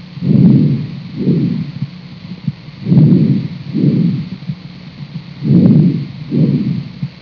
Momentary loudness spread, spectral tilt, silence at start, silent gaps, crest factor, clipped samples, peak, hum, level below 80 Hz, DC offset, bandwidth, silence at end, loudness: 19 LU; -11 dB/octave; 0 s; none; 14 dB; 0.1%; 0 dBFS; none; -46 dBFS; under 0.1%; 5.4 kHz; 0.05 s; -13 LUFS